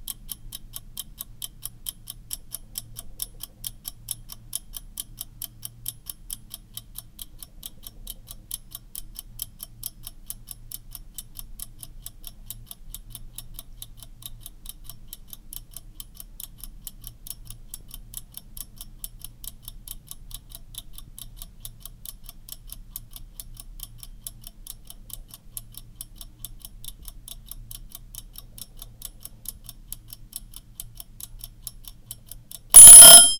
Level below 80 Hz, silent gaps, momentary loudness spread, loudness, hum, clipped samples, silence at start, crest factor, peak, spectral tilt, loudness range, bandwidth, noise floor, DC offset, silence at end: -44 dBFS; none; 5 LU; -2 LUFS; none; 0.2%; 32.75 s; 22 dB; 0 dBFS; 1 dB/octave; 6 LU; 18 kHz; -43 dBFS; under 0.1%; 0.05 s